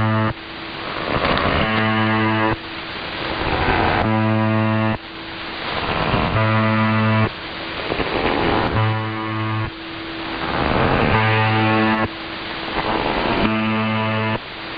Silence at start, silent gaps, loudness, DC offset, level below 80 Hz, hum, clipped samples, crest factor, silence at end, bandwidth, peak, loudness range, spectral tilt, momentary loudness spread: 0 s; none; -20 LUFS; 0.2%; -36 dBFS; none; under 0.1%; 18 dB; 0 s; 5.2 kHz; -2 dBFS; 2 LU; -8.5 dB/octave; 10 LU